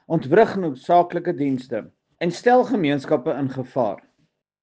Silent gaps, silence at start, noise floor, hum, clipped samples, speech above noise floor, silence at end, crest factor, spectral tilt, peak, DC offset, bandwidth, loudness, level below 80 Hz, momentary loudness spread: none; 0.1 s; -68 dBFS; none; under 0.1%; 48 dB; 0.65 s; 18 dB; -7 dB/octave; -4 dBFS; under 0.1%; 9 kHz; -21 LUFS; -64 dBFS; 10 LU